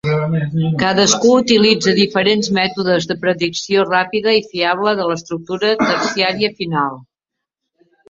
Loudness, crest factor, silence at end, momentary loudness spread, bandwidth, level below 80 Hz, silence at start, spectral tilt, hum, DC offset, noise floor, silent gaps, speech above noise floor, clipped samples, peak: -15 LUFS; 16 dB; 1.1 s; 8 LU; 7.8 kHz; -54 dBFS; 0.05 s; -4 dB/octave; none; under 0.1%; -81 dBFS; none; 66 dB; under 0.1%; 0 dBFS